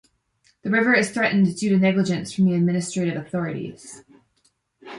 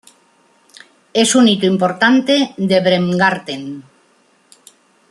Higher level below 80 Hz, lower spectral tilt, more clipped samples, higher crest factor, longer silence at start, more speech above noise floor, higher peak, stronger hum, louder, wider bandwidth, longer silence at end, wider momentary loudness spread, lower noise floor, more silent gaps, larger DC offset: about the same, -64 dBFS vs -62 dBFS; first, -6 dB/octave vs -4 dB/octave; neither; about the same, 18 dB vs 16 dB; second, 0.65 s vs 1.15 s; first, 46 dB vs 41 dB; second, -6 dBFS vs 0 dBFS; neither; second, -21 LUFS vs -14 LUFS; about the same, 11.5 kHz vs 12.5 kHz; second, 0 s vs 1.3 s; about the same, 15 LU vs 15 LU; first, -67 dBFS vs -55 dBFS; neither; neither